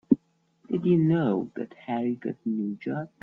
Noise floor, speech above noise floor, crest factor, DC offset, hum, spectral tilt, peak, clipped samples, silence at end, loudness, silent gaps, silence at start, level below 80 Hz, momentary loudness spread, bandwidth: -63 dBFS; 36 dB; 22 dB; under 0.1%; none; -10.5 dB/octave; -6 dBFS; under 0.1%; 0.15 s; -27 LUFS; none; 0.1 s; -68 dBFS; 11 LU; 4.2 kHz